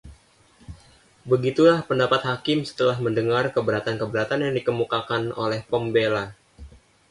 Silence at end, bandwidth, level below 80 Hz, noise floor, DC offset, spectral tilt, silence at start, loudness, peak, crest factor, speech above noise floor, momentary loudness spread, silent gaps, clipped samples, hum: 0.4 s; 11.5 kHz; -54 dBFS; -56 dBFS; under 0.1%; -6.5 dB/octave; 0.05 s; -23 LUFS; -6 dBFS; 18 dB; 34 dB; 8 LU; none; under 0.1%; none